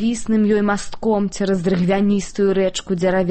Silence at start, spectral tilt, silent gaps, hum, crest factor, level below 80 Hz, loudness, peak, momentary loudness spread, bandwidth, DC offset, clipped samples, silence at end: 0 s; -6 dB/octave; none; none; 12 dB; -42 dBFS; -19 LUFS; -6 dBFS; 4 LU; 8.8 kHz; under 0.1%; under 0.1%; 0 s